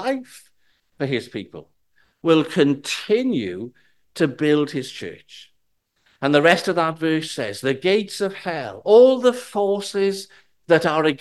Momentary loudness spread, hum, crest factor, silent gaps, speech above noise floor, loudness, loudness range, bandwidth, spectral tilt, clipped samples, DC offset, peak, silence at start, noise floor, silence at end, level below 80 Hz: 17 LU; none; 20 dB; none; 50 dB; -20 LUFS; 5 LU; 12.5 kHz; -5 dB/octave; under 0.1%; 0.1%; 0 dBFS; 0 s; -70 dBFS; 0.05 s; -64 dBFS